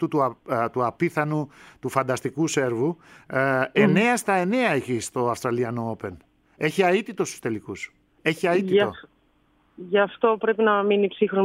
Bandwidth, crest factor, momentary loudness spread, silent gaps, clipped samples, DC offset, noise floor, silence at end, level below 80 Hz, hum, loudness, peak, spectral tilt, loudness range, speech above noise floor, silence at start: 16 kHz; 18 dB; 11 LU; none; under 0.1%; under 0.1%; -63 dBFS; 0 s; -64 dBFS; none; -23 LUFS; -4 dBFS; -5.5 dB/octave; 4 LU; 40 dB; 0 s